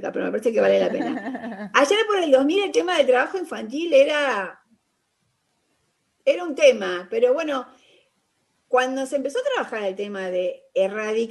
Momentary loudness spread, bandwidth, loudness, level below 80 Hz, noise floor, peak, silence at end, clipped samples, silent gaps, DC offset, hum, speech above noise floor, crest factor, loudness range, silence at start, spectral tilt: 10 LU; 12 kHz; -22 LUFS; -72 dBFS; -71 dBFS; -4 dBFS; 0 s; under 0.1%; none; under 0.1%; none; 50 dB; 20 dB; 5 LU; 0 s; -3.5 dB/octave